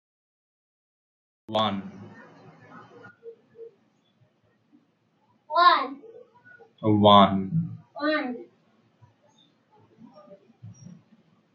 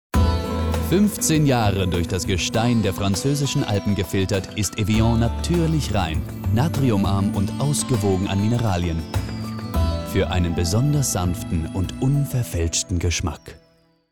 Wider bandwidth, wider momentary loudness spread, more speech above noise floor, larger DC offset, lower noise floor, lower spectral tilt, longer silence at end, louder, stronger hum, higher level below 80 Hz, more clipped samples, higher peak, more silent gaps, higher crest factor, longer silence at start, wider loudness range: second, 6.6 kHz vs 18.5 kHz; first, 30 LU vs 6 LU; first, 47 dB vs 38 dB; second, under 0.1% vs 0.4%; first, -68 dBFS vs -58 dBFS; first, -7.5 dB/octave vs -5.5 dB/octave; first, 0.85 s vs 0.55 s; about the same, -22 LUFS vs -21 LUFS; neither; second, -76 dBFS vs -32 dBFS; neither; first, -4 dBFS vs -8 dBFS; neither; first, 24 dB vs 14 dB; first, 1.5 s vs 0.15 s; first, 13 LU vs 2 LU